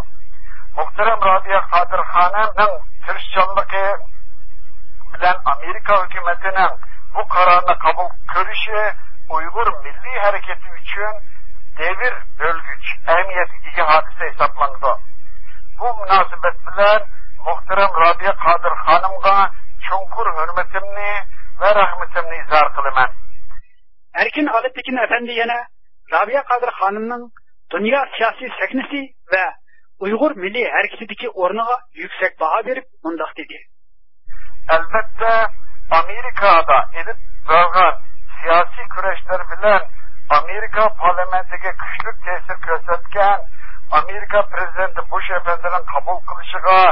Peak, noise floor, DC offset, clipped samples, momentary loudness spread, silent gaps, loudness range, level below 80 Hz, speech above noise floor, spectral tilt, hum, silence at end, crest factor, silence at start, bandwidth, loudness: 0 dBFS; -60 dBFS; 20%; under 0.1%; 12 LU; none; 5 LU; -42 dBFS; 44 dB; -9 dB/octave; none; 0 s; 18 dB; 0 s; 5.8 kHz; -17 LUFS